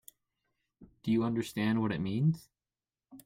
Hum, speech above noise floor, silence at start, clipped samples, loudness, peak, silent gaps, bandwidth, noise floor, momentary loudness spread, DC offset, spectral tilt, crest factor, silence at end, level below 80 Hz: none; over 59 dB; 0.8 s; under 0.1%; -32 LUFS; -18 dBFS; none; 16.5 kHz; under -90 dBFS; 6 LU; under 0.1%; -7 dB/octave; 16 dB; 0.05 s; -66 dBFS